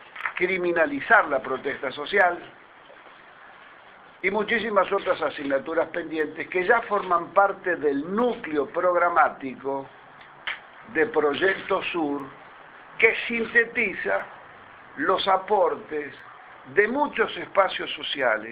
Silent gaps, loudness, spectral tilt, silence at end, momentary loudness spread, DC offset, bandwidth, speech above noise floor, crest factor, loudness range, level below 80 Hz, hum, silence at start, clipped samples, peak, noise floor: none; -24 LUFS; -6.5 dB/octave; 0 s; 13 LU; under 0.1%; 5 kHz; 25 dB; 22 dB; 4 LU; -62 dBFS; none; 0 s; under 0.1%; -2 dBFS; -49 dBFS